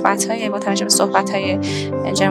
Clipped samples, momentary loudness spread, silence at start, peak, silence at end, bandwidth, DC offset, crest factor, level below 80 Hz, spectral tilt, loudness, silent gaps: under 0.1%; 7 LU; 0 s; 0 dBFS; 0 s; 17 kHz; under 0.1%; 18 dB; -64 dBFS; -3.5 dB/octave; -18 LUFS; none